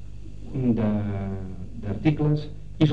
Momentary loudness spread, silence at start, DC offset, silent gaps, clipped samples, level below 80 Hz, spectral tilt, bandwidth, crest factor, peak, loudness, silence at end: 15 LU; 0 s; 1%; none; under 0.1%; -42 dBFS; -9 dB/octave; 6.4 kHz; 20 dB; -6 dBFS; -26 LUFS; 0 s